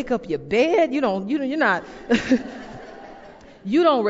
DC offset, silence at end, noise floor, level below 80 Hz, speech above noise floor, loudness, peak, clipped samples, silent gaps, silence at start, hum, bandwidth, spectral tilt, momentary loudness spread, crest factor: under 0.1%; 0 s; -44 dBFS; -52 dBFS; 23 dB; -21 LUFS; -6 dBFS; under 0.1%; none; 0 s; none; 7.8 kHz; -5.5 dB/octave; 20 LU; 16 dB